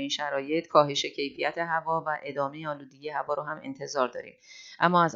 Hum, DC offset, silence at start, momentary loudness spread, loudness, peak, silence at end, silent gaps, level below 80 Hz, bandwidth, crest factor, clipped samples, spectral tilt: none; under 0.1%; 0 s; 14 LU; -29 LUFS; -6 dBFS; 0 s; none; -78 dBFS; 7.8 kHz; 24 dB; under 0.1%; -4.5 dB/octave